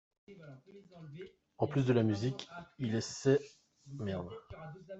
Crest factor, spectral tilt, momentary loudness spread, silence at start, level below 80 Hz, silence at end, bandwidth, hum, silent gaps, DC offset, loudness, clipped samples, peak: 20 dB; -6.5 dB/octave; 24 LU; 0.3 s; -68 dBFS; 0 s; 8.2 kHz; none; none; under 0.1%; -34 LUFS; under 0.1%; -16 dBFS